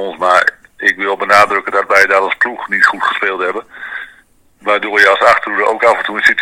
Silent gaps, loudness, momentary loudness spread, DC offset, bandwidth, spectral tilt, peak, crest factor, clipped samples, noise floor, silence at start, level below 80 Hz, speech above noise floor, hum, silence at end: none; -11 LUFS; 11 LU; under 0.1%; over 20 kHz; -2.5 dB/octave; 0 dBFS; 14 dB; 0.8%; -48 dBFS; 0 s; -56 dBFS; 36 dB; none; 0 s